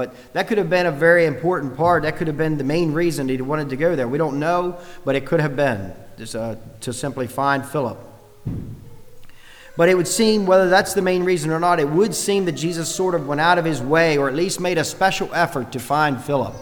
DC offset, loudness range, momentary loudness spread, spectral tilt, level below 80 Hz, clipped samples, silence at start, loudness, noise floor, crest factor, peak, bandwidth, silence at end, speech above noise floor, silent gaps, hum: under 0.1%; 7 LU; 13 LU; -5 dB/octave; -46 dBFS; under 0.1%; 0 s; -19 LUFS; -40 dBFS; 18 dB; -2 dBFS; over 20 kHz; 0 s; 21 dB; none; none